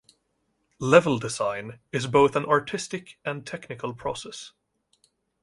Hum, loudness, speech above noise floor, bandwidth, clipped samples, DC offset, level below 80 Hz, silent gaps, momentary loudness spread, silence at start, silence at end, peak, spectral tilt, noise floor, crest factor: none; -25 LUFS; 49 dB; 11.5 kHz; under 0.1%; under 0.1%; -60 dBFS; none; 17 LU; 0.8 s; 0.95 s; -2 dBFS; -5 dB/octave; -74 dBFS; 24 dB